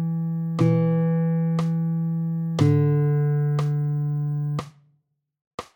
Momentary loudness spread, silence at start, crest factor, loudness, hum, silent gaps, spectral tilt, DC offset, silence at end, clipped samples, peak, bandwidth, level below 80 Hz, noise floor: 8 LU; 0 s; 16 dB; -23 LUFS; none; 5.47-5.58 s; -9 dB/octave; under 0.1%; 0.1 s; under 0.1%; -6 dBFS; 18 kHz; -64 dBFS; -70 dBFS